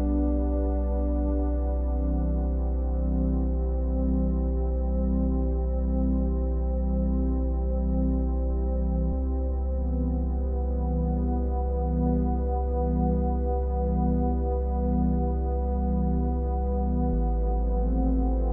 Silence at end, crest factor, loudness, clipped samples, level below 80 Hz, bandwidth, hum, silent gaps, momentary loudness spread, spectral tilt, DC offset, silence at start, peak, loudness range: 0 s; 12 dB; -27 LUFS; under 0.1%; -26 dBFS; 1.8 kHz; none; none; 3 LU; -14 dB/octave; under 0.1%; 0 s; -14 dBFS; 1 LU